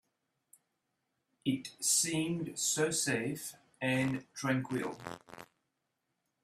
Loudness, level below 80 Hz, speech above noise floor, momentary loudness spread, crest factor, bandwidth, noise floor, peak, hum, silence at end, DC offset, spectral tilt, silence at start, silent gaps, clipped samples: -33 LUFS; -74 dBFS; 50 dB; 17 LU; 20 dB; 16 kHz; -84 dBFS; -16 dBFS; none; 1 s; under 0.1%; -3 dB/octave; 1.45 s; none; under 0.1%